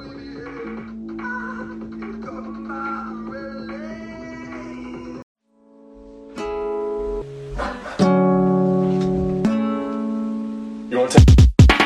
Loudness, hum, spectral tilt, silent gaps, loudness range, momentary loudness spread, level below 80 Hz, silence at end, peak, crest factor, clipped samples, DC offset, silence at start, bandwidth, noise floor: -20 LUFS; none; -7 dB/octave; 5.23-5.35 s; 14 LU; 20 LU; -26 dBFS; 0 s; 0 dBFS; 20 dB; under 0.1%; under 0.1%; 0 s; 12 kHz; -51 dBFS